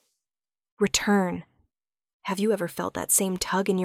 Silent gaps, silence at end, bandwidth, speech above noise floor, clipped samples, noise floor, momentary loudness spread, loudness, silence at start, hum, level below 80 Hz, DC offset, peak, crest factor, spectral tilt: 2.13-2.20 s; 0 s; 16.5 kHz; over 65 dB; under 0.1%; under -90 dBFS; 10 LU; -25 LUFS; 0.8 s; none; -58 dBFS; under 0.1%; -6 dBFS; 20 dB; -3.5 dB/octave